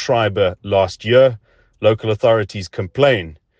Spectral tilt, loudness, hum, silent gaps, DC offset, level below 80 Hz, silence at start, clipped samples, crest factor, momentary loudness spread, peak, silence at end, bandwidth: -6 dB/octave; -17 LUFS; none; none; under 0.1%; -52 dBFS; 0 s; under 0.1%; 16 dB; 12 LU; 0 dBFS; 0.25 s; 8.2 kHz